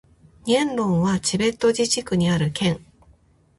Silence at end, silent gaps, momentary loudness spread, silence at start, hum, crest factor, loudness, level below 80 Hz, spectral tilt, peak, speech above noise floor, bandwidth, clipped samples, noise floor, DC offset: 0.8 s; none; 4 LU; 0.45 s; none; 16 dB; -21 LUFS; -50 dBFS; -5 dB/octave; -6 dBFS; 36 dB; 11.5 kHz; under 0.1%; -56 dBFS; under 0.1%